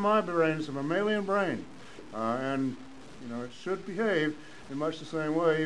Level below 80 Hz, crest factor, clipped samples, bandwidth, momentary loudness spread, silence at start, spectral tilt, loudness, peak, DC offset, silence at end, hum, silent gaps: -68 dBFS; 18 dB; under 0.1%; 11 kHz; 17 LU; 0 s; -6 dB/octave; -31 LUFS; -14 dBFS; 0.4%; 0 s; none; none